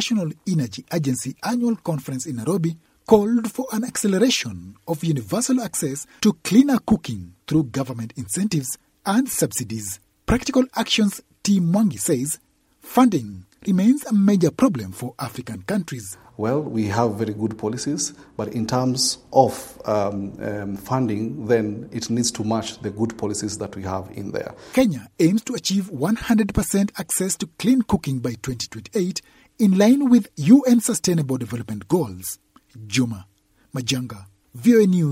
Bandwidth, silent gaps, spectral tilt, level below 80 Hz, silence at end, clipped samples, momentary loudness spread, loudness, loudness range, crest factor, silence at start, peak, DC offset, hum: 16 kHz; none; -5 dB/octave; -48 dBFS; 0 s; under 0.1%; 13 LU; -22 LUFS; 6 LU; 20 dB; 0 s; 0 dBFS; under 0.1%; none